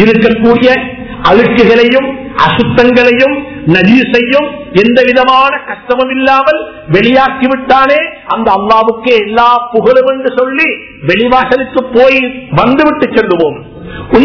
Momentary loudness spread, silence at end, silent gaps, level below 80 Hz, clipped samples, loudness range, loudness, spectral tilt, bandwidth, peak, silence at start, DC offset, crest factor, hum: 7 LU; 0 s; none; -36 dBFS; 5%; 2 LU; -8 LUFS; -7 dB/octave; 5.4 kHz; 0 dBFS; 0 s; 0.4%; 8 dB; none